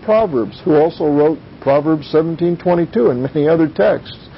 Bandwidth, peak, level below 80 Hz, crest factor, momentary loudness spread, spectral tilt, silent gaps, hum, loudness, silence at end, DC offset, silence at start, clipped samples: 5.8 kHz; -2 dBFS; -46 dBFS; 12 dB; 4 LU; -12.5 dB/octave; none; none; -15 LUFS; 0 s; under 0.1%; 0 s; under 0.1%